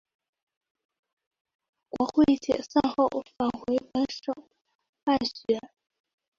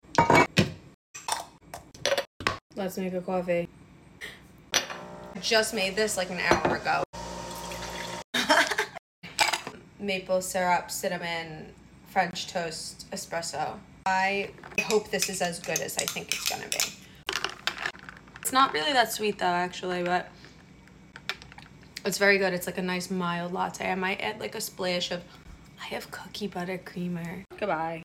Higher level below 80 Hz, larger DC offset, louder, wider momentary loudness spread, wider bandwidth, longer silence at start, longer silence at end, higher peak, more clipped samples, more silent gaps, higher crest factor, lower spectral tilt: about the same, -60 dBFS vs -56 dBFS; neither; about the same, -27 LUFS vs -28 LUFS; second, 11 LU vs 16 LU; second, 7.4 kHz vs 16.5 kHz; first, 1.95 s vs 0.1 s; first, 0.7 s vs 0 s; about the same, -10 dBFS vs -8 dBFS; neither; second, 4.75-4.79 s, 4.89-4.93 s, 5.03-5.07 s vs 0.94-1.14 s, 2.27-2.40 s, 2.61-2.70 s, 7.06-7.13 s, 8.24-8.33 s, 8.99-9.22 s; about the same, 20 dB vs 22 dB; first, -5.5 dB/octave vs -3 dB/octave